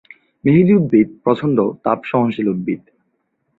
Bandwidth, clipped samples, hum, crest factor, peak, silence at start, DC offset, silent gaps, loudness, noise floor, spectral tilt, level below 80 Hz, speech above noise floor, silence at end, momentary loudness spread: 4.3 kHz; under 0.1%; none; 16 dB; -2 dBFS; 0.45 s; under 0.1%; none; -16 LUFS; -68 dBFS; -10.5 dB/octave; -54 dBFS; 53 dB; 0.8 s; 10 LU